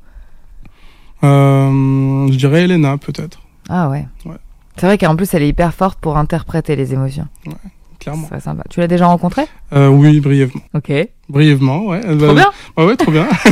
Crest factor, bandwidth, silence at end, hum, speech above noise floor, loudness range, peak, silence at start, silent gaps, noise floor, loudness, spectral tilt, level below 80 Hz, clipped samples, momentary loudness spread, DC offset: 12 dB; 14.5 kHz; 0 s; none; 26 dB; 6 LU; 0 dBFS; 0.15 s; none; -38 dBFS; -13 LUFS; -7.5 dB/octave; -34 dBFS; under 0.1%; 16 LU; under 0.1%